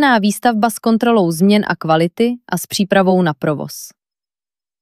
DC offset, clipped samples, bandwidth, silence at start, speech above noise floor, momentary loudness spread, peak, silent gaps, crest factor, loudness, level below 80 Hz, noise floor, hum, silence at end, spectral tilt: under 0.1%; under 0.1%; 14.5 kHz; 0 s; over 75 dB; 10 LU; -2 dBFS; none; 14 dB; -15 LUFS; -62 dBFS; under -90 dBFS; none; 0.95 s; -5.5 dB/octave